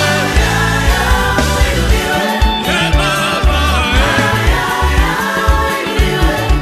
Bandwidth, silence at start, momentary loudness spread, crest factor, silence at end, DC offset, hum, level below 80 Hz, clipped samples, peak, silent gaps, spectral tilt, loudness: 14.5 kHz; 0 s; 2 LU; 12 dB; 0 s; under 0.1%; none; -16 dBFS; under 0.1%; 0 dBFS; none; -4.5 dB/octave; -13 LUFS